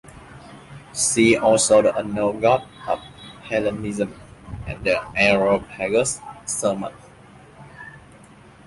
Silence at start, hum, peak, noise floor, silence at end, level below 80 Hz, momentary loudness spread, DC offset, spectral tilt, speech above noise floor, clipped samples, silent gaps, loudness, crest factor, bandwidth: 0.05 s; none; -4 dBFS; -47 dBFS; 0.7 s; -48 dBFS; 23 LU; under 0.1%; -3.5 dB/octave; 27 dB; under 0.1%; none; -20 LUFS; 18 dB; 11.5 kHz